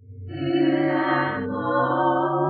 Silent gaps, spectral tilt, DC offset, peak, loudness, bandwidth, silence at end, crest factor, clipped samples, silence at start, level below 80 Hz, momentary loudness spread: none; -11 dB/octave; under 0.1%; -10 dBFS; -22 LUFS; 4.8 kHz; 0 s; 14 dB; under 0.1%; 0.1 s; -62 dBFS; 6 LU